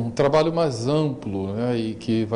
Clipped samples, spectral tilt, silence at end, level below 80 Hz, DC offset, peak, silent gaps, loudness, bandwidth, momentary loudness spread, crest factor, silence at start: under 0.1%; -7 dB/octave; 0 s; -52 dBFS; under 0.1%; -10 dBFS; none; -23 LUFS; 11 kHz; 7 LU; 14 dB; 0 s